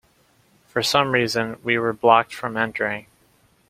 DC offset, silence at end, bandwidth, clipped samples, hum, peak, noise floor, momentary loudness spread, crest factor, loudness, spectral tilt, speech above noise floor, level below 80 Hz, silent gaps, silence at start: under 0.1%; 0.7 s; 16 kHz; under 0.1%; none; -2 dBFS; -60 dBFS; 10 LU; 22 dB; -21 LUFS; -4 dB/octave; 39 dB; -60 dBFS; none; 0.75 s